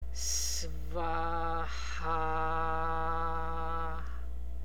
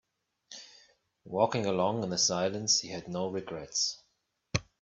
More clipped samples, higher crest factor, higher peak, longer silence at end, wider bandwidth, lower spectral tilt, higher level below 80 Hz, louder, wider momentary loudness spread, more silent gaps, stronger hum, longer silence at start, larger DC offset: neither; second, 16 dB vs 22 dB; second, -20 dBFS vs -12 dBFS; second, 0 s vs 0.2 s; first, 17 kHz vs 8.4 kHz; about the same, -3 dB/octave vs -3 dB/octave; first, -40 dBFS vs -62 dBFS; second, -35 LUFS vs -30 LUFS; second, 7 LU vs 20 LU; neither; neither; second, 0 s vs 0.5 s; first, 2% vs under 0.1%